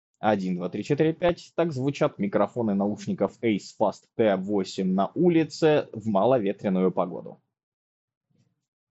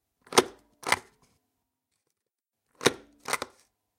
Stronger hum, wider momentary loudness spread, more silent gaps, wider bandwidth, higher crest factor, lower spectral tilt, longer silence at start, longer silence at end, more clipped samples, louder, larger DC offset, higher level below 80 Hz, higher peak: neither; second, 6 LU vs 15 LU; neither; second, 8 kHz vs 16.5 kHz; second, 18 dB vs 32 dB; first, -6.5 dB/octave vs -2 dB/octave; about the same, 0.2 s vs 0.3 s; first, 1.55 s vs 0.55 s; neither; first, -25 LUFS vs -28 LUFS; neither; first, -62 dBFS vs -68 dBFS; second, -8 dBFS vs -2 dBFS